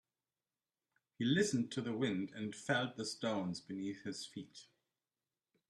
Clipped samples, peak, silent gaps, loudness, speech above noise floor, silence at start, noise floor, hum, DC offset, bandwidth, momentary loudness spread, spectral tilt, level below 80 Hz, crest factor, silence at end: under 0.1%; -22 dBFS; none; -39 LUFS; over 51 dB; 1.2 s; under -90 dBFS; none; under 0.1%; 12.5 kHz; 13 LU; -4.5 dB/octave; -78 dBFS; 20 dB; 1.05 s